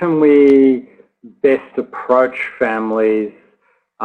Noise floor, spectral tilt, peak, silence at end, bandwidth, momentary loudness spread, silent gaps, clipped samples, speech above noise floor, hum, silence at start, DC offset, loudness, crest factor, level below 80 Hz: -60 dBFS; -8 dB/octave; -2 dBFS; 0 s; 4.5 kHz; 13 LU; none; under 0.1%; 47 dB; none; 0 s; under 0.1%; -14 LUFS; 14 dB; -58 dBFS